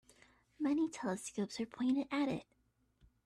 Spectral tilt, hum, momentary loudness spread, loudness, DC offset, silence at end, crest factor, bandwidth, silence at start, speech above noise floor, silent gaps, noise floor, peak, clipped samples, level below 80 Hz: -5 dB/octave; none; 6 LU; -38 LUFS; under 0.1%; 0.85 s; 14 dB; 13 kHz; 0.6 s; 34 dB; none; -71 dBFS; -26 dBFS; under 0.1%; -74 dBFS